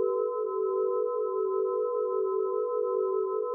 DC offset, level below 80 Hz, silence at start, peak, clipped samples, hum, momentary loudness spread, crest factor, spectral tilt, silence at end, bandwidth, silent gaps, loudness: under 0.1%; under -90 dBFS; 0 s; -18 dBFS; under 0.1%; none; 1 LU; 10 dB; 13 dB/octave; 0 s; 1.4 kHz; none; -29 LUFS